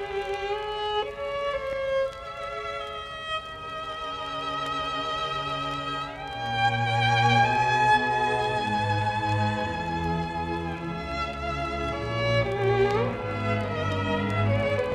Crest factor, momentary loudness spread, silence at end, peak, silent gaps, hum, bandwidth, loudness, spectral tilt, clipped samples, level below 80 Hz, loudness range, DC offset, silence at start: 18 dB; 11 LU; 0 s; -10 dBFS; none; none; 11 kHz; -27 LUFS; -5.5 dB/octave; under 0.1%; -46 dBFS; 8 LU; under 0.1%; 0 s